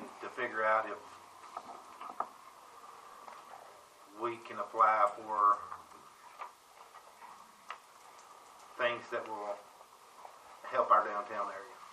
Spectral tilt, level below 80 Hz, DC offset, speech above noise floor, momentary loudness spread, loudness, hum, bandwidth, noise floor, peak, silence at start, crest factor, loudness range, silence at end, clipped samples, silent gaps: -3.5 dB/octave; -86 dBFS; under 0.1%; 25 dB; 26 LU; -33 LUFS; none; 15 kHz; -58 dBFS; -14 dBFS; 0 s; 24 dB; 12 LU; 0 s; under 0.1%; none